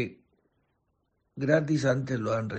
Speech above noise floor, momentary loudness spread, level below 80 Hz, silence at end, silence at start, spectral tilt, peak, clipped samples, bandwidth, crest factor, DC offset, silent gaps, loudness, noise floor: 49 dB; 9 LU; -64 dBFS; 0 s; 0 s; -7 dB/octave; -8 dBFS; under 0.1%; 8.4 kHz; 20 dB; under 0.1%; none; -28 LUFS; -75 dBFS